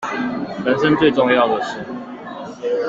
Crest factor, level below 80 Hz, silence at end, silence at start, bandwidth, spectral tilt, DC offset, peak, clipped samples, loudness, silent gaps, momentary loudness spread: 16 dB; -54 dBFS; 0 s; 0 s; 7.8 kHz; -6 dB/octave; under 0.1%; -2 dBFS; under 0.1%; -18 LUFS; none; 17 LU